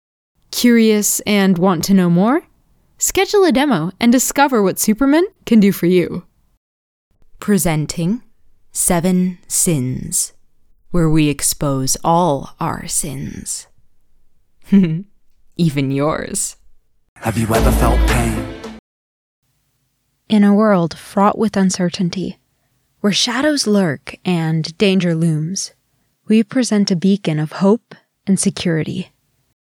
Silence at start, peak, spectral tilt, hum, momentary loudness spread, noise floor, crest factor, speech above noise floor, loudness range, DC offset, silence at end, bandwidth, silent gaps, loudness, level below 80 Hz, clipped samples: 0.5 s; -2 dBFS; -5 dB/octave; none; 11 LU; -66 dBFS; 16 dB; 51 dB; 5 LU; under 0.1%; 0.7 s; over 20 kHz; 6.57-7.11 s, 17.09-17.16 s, 18.79-19.42 s; -16 LUFS; -30 dBFS; under 0.1%